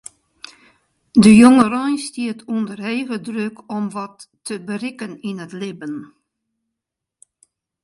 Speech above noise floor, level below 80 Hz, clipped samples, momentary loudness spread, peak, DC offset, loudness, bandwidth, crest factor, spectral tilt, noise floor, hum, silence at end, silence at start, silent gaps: 66 dB; -54 dBFS; under 0.1%; 21 LU; 0 dBFS; under 0.1%; -17 LUFS; 11.5 kHz; 18 dB; -5.5 dB/octave; -83 dBFS; none; 1.8 s; 1.15 s; none